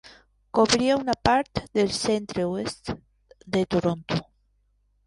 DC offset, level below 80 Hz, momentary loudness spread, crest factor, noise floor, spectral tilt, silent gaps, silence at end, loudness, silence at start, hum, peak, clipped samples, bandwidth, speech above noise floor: under 0.1%; -50 dBFS; 10 LU; 22 dB; -67 dBFS; -4.5 dB/octave; none; 0.85 s; -25 LUFS; 0.55 s; 50 Hz at -60 dBFS; -4 dBFS; under 0.1%; 11.5 kHz; 43 dB